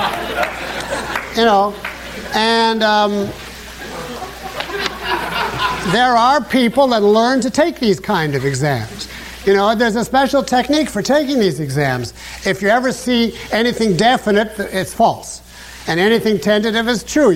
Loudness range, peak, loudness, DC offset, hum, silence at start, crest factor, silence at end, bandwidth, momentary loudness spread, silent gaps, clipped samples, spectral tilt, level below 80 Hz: 4 LU; -2 dBFS; -16 LUFS; under 0.1%; none; 0 s; 14 dB; 0 s; 16.5 kHz; 14 LU; none; under 0.1%; -4.5 dB/octave; -42 dBFS